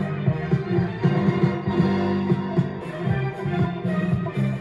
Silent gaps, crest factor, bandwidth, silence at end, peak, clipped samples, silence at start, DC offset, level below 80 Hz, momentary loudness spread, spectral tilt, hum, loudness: none; 16 dB; 7.4 kHz; 0 s; -6 dBFS; under 0.1%; 0 s; under 0.1%; -48 dBFS; 4 LU; -9 dB/octave; none; -23 LUFS